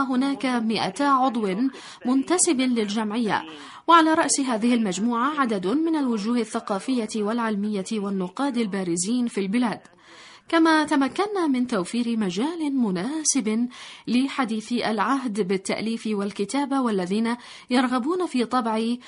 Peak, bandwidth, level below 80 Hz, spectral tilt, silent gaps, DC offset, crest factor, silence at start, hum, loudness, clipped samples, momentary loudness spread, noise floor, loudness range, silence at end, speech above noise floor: -4 dBFS; 11 kHz; -68 dBFS; -4 dB/octave; none; under 0.1%; 18 dB; 0 s; none; -23 LUFS; under 0.1%; 7 LU; -48 dBFS; 4 LU; 0 s; 25 dB